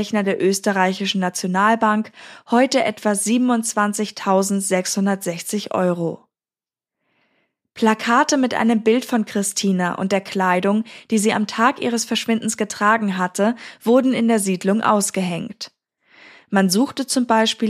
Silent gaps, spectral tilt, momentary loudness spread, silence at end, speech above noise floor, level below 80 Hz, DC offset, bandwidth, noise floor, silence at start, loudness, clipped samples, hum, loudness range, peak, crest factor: none; -4 dB/octave; 7 LU; 0 s; over 71 dB; -72 dBFS; under 0.1%; 15.5 kHz; under -90 dBFS; 0 s; -19 LUFS; under 0.1%; none; 3 LU; -2 dBFS; 18 dB